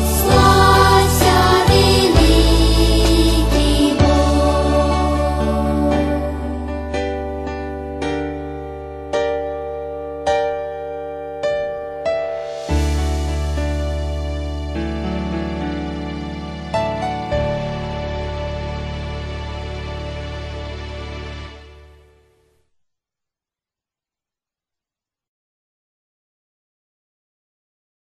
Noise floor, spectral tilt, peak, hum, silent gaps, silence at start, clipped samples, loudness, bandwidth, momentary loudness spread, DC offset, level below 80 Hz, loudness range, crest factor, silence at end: -90 dBFS; -5.5 dB/octave; 0 dBFS; none; none; 0 s; under 0.1%; -18 LUFS; 13 kHz; 16 LU; under 0.1%; -24 dBFS; 16 LU; 18 dB; 6.2 s